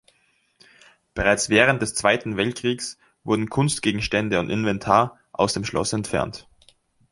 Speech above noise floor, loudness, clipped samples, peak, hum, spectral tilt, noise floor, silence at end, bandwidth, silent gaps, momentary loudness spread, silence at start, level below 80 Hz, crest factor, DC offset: 43 dB; -22 LUFS; under 0.1%; 0 dBFS; none; -4 dB/octave; -65 dBFS; 0.7 s; 11.5 kHz; none; 11 LU; 1.15 s; -48 dBFS; 22 dB; under 0.1%